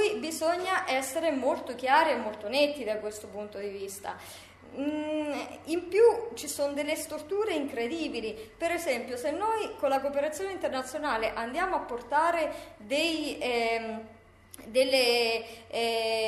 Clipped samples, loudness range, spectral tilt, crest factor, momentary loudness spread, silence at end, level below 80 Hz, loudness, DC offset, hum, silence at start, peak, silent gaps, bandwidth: under 0.1%; 3 LU; -2.5 dB/octave; 20 dB; 14 LU; 0 s; -62 dBFS; -29 LUFS; under 0.1%; none; 0 s; -10 dBFS; none; 14 kHz